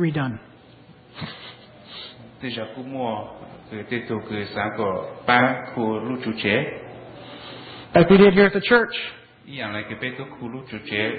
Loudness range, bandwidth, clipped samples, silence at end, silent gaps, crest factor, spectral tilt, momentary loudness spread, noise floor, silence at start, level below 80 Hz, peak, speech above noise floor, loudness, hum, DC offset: 13 LU; 4.8 kHz; under 0.1%; 0 s; none; 22 dB; -11 dB/octave; 23 LU; -49 dBFS; 0 s; -52 dBFS; -2 dBFS; 27 dB; -21 LUFS; none; under 0.1%